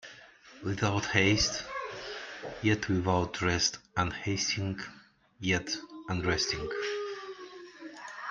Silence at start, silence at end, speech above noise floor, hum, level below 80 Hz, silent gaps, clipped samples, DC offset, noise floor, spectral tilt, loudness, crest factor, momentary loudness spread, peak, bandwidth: 0.05 s; 0 s; 23 dB; none; -54 dBFS; none; under 0.1%; under 0.1%; -54 dBFS; -4 dB/octave; -31 LUFS; 24 dB; 17 LU; -10 dBFS; 9.2 kHz